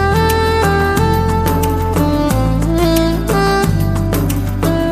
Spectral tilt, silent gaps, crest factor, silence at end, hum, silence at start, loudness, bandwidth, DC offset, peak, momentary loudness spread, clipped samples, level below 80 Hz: -6 dB/octave; none; 14 dB; 0 s; none; 0 s; -14 LUFS; 15.5 kHz; under 0.1%; 0 dBFS; 3 LU; under 0.1%; -22 dBFS